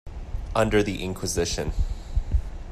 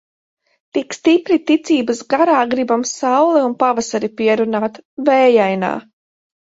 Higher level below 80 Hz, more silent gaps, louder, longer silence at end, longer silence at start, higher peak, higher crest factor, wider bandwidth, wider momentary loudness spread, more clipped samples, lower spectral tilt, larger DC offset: first, -30 dBFS vs -62 dBFS; second, none vs 4.85-4.97 s; second, -27 LUFS vs -16 LUFS; second, 0 s vs 0.65 s; second, 0.05 s vs 0.75 s; second, -8 dBFS vs 0 dBFS; about the same, 16 dB vs 16 dB; first, 14.5 kHz vs 8 kHz; about the same, 10 LU vs 9 LU; neither; about the same, -5 dB/octave vs -4.5 dB/octave; neither